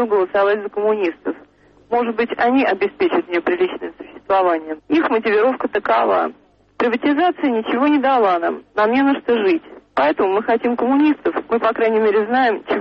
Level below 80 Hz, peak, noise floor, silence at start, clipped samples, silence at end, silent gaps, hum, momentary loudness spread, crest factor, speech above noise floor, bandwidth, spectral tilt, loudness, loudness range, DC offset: -58 dBFS; -6 dBFS; -49 dBFS; 0 s; under 0.1%; 0 s; none; none; 7 LU; 12 dB; 32 dB; 6 kHz; -7 dB/octave; -18 LUFS; 2 LU; under 0.1%